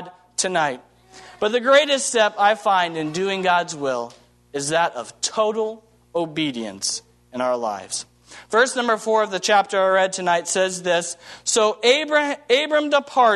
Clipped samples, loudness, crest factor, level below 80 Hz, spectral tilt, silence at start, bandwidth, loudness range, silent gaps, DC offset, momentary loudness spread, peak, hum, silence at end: under 0.1%; -20 LUFS; 20 dB; -68 dBFS; -2 dB/octave; 0 s; 12.5 kHz; 5 LU; none; under 0.1%; 12 LU; -2 dBFS; none; 0 s